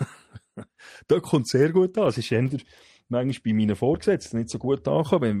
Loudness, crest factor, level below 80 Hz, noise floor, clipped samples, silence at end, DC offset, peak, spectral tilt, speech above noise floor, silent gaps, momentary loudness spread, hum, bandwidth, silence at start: -24 LUFS; 16 dB; -56 dBFS; -48 dBFS; under 0.1%; 0 s; under 0.1%; -8 dBFS; -7 dB/octave; 25 dB; none; 14 LU; none; 13 kHz; 0 s